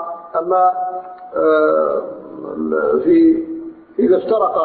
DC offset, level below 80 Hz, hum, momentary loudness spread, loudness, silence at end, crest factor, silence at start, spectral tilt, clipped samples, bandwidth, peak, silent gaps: under 0.1%; -56 dBFS; none; 16 LU; -16 LUFS; 0 s; 12 dB; 0 s; -11.5 dB/octave; under 0.1%; 4.5 kHz; -4 dBFS; none